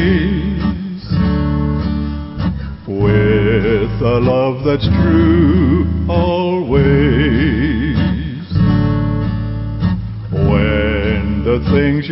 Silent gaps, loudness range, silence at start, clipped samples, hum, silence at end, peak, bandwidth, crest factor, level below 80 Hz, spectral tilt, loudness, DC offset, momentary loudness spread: none; 3 LU; 0 s; under 0.1%; none; 0 s; -2 dBFS; 5.8 kHz; 10 dB; -24 dBFS; -7 dB/octave; -15 LUFS; under 0.1%; 9 LU